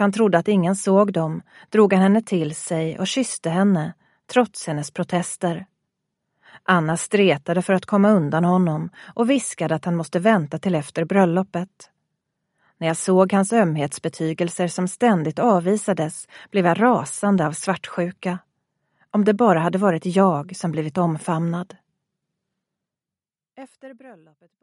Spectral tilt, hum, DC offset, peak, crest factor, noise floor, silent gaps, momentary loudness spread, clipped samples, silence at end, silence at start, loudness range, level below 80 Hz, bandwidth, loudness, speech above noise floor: -6 dB/octave; none; under 0.1%; -2 dBFS; 20 dB; under -90 dBFS; none; 10 LU; under 0.1%; 0.5 s; 0 s; 4 LU; -68 dBFS; 11.5 kHz; -20 LUFS; over 70 dB